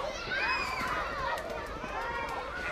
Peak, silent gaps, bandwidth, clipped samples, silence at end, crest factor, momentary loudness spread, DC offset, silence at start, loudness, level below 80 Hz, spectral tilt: -18 dBFS; none; 15.5 kHz; under 0.1%; 0 s; 16 dB; 7 LU; under 0.1%; 0 s; -33 LUFS; -48 dBFS; -3.5 dB/octave